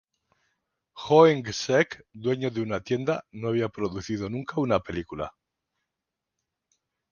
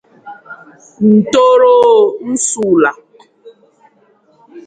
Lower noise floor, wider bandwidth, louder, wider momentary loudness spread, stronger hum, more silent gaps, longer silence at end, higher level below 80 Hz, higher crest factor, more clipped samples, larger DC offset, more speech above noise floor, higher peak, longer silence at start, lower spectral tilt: first, -86 dBFS vs -52 dBFS; second, 7.2 kHz vs 9.4 kHz; second, -26 LUFS vs -10 LUFS; first, 15 LU vs 8 LU; neither; neither; first, 1.8 s vs 0.05 s; about the same, -56 dBFS vs -56 dBFS; first, 24 dB vs 12 dB; neither; neither; first, 61 dB vs 42 dB; second, -4 dBFS vs 0 dBFS; first, 0.95 s vs 0.25 s; first, -6 dB/octave vs -4.5 dB/octave